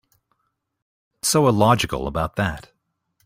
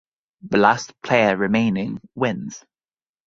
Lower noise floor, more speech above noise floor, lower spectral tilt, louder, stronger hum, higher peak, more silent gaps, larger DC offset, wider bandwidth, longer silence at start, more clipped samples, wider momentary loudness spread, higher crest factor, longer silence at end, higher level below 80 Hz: second, -73 dBFS vs under -90 dBFS; second, 54 dB vs over 70 dB; about the same, -4.5 dB/octave vs -5.5 dB/octave; about the same, -20 LUFS vs -20 LUFS; neither; second, -4 dBFS vs 0 dBFS; neither; neither; first, 16 kHz vs 7.6 kHz; first, 1.25 s vs 0.45 s; neither; second, 10 LU vs 14 LU; about the same, 20 dB vs 20 dB; about the same, 0.65 s vs 0.7 s; first, -44 dBFS vs -58 dBFS